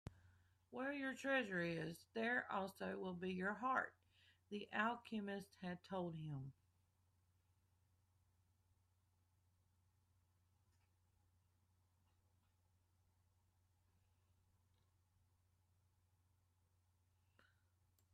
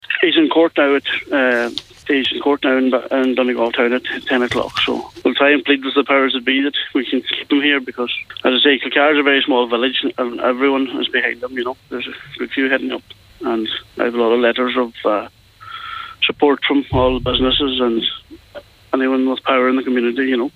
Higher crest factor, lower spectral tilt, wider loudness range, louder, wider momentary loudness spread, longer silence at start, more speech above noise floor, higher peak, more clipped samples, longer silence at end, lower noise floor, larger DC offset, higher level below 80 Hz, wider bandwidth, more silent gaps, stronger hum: first, 24 dB vs 16 dB; about the same, -6 dB/octave vs -5.5 dB/octave; first, 11 LU vs 4 LU; second, -46 LUFS vs -16 LUFS; about the same, 11 LU vs 10 LU; about the same, 0.05 s vs 0.1 s; first, 35 dB vs 22 dB; second, -28 dBFS vs -2 dBFS; neither; first, 11.6 s vs 0.05 s; first, -81 dBFS vs -39 dBFS; neither; second, -84 dBFS vs -42 dBFS; first, 13 kHz vs 9.4 kHz; neither; neither